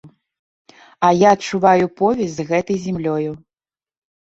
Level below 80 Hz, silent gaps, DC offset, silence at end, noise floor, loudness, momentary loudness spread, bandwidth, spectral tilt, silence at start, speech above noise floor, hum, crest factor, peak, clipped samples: -56 dBFS; 0.39-0.65 s; under 0.1%; 0.95 s; under -90 dBFS; -17 LUFS; 9 LU; 8 kHz; -6 dB/octave; 0.05 s; over 74 dB; none; 18 dB; 0 dBFS; under 0.1%